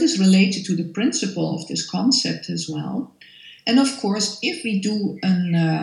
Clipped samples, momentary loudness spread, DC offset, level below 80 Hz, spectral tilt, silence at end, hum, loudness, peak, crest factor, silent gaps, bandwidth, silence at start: under 0.1%; 10 LU; under 0.1%; -70 dBFS; -4.5 dB/octave; 0 s; none; -21 LUFS; -4 dBFS; 16 dB; none; 11.5 kHz; 0 s